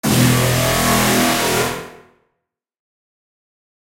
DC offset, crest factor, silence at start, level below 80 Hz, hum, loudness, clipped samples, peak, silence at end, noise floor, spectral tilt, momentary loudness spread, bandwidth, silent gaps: under 0.1%; 16 dB; 0.05 s; -38 dBFS; none; -15 LUFS; under 0.1%; -2 dBFS; 2 s; -76 dBFS; -4 dB/octave; 6 LU; 16 kHz; none